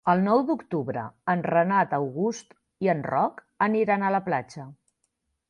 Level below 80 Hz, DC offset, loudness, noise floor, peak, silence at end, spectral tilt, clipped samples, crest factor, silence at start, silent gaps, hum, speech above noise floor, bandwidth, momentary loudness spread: -68 dBFS; under 0.1%; -25 LUFS; -76 dBFS; -8 dBFS; 0.75 s; -7 dB/octave; under 0.1%; 18 dB; 0.05 s; none; none; 52 dB; 9.8 kHz; 10 LU